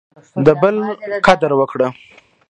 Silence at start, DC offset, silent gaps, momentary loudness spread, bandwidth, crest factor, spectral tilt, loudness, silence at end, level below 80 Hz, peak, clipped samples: 0.35 s; under 0.1%; none; 9 LU; 10.5 kHz; 16 dB; -6.5 dB/octave; -15 LUFS; 0.6 s; -46 dBFS; 0 dBFS; under 0.1%